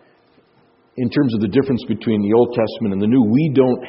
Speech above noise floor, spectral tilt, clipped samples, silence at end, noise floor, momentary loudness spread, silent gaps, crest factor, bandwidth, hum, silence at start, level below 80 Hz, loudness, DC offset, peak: 40 dB; -7.5 dB/octave; under 0.1%; 0 s; -56 dBFS; 6 LU; none; 16 dB; 5.8 kHz; none; 0.95 s; -56 dBFS; -17 LUFS; under 0.1%; -2 dBFS